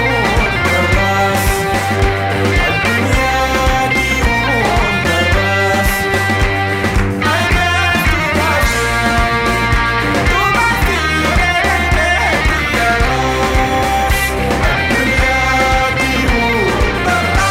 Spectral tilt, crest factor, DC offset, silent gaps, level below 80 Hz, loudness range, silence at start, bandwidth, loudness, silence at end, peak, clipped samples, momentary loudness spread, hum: -4.5 dB/octave; 12 dB; under 0.1%; none; -20 dBFS; 1 LU; 0 s; 16 kHz; -13 LUFS; 0 s; 0 dBFS; under 0.1%; 2 LU; none